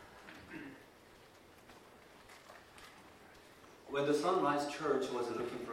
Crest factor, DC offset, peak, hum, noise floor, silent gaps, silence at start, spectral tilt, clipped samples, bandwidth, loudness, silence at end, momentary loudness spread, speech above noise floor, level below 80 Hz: 20 dB; under 0.1%; -20 dBFS; none; -60 dBFS; none; 0 s; -5 dB/octave; under 0.1%; 16 kHz; -36 LUFS; 0 s; 26 LU; 25 dB; -74 dBFS